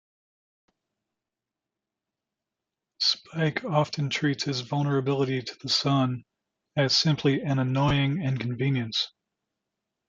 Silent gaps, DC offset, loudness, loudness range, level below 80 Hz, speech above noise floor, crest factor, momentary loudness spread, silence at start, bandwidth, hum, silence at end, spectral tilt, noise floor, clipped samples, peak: none; under 0.1%; -26 LUFS; 6 LU; -58 dBFS; 63 dB; 18 dB; 6 LU; 3 s; 7.6 kHz; none; 1 s; -5.5 dB/octave; -89 dBFS; under 0.1%; -10 dBFS